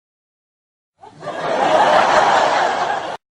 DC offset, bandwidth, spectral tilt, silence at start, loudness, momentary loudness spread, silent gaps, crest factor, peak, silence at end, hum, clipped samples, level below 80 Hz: under 0.1%; 11 kHz; -3 dB/octave; 1.05 s; -15 LUFS; 13 LU; none; 16 dB; -2 dBFS; 0.2 s; none; under 0.1%; -56 dBFS